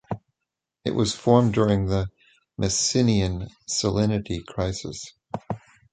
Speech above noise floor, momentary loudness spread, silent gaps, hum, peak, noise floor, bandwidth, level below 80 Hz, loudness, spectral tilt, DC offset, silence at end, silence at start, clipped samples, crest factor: 62 dB; 16 LU; none; none; -2 dBFS; -84 dBFS; 9.4 kHz; -42 dBFS; -24 LUFS; -5 dB/octave; under 0.1%; 0.35 s; 0.1 s; under 0.1%; 22 dB